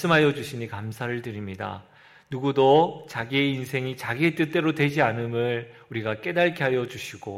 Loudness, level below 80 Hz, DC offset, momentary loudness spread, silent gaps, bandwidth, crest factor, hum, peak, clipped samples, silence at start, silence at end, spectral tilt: -25 LUFS; -64 dBFS; under 0.1%; 14 LU; none; 16 kHz; 18 dB; none; -6 dBFS; under 0.1%; 0 s; 0 s; -6 dB/octave